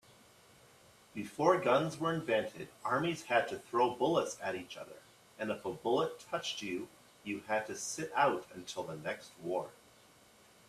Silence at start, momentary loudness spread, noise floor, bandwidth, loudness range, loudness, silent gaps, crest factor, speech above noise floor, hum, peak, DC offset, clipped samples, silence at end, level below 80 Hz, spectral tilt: 1.15 s; 14 LU; -63 dBFS; 14.5 kHz; 5 LU; -35 LUFS; none; 22 dB; 28 dB; none; -14 dBFS; under 0.1%; under 0.1%; 0.95 s; -74 dBFS; -4.5 dB/octave